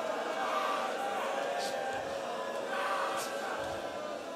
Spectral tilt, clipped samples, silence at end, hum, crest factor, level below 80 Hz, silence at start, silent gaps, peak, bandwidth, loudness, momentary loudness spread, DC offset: -2.5 dB/octave; under 0.1%; 0 s; none; 16 dB; -72 dBFS; 0 s; none; -20 dBFS; 16 kHz; -35 LUFS; 5 LU; under 0.1%